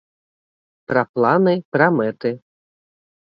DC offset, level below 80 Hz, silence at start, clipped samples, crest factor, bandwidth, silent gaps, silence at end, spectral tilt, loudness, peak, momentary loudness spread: under 0.1%; -66 dBFS; 0.9 s; under 0.1%; 20 dB; 5.4 kHz; 1.09-1.14 s, 1.65-1.72 s; 0.9 s; -9.5 dB/octave; -18 LUFS; 0 dBFS; 10 LU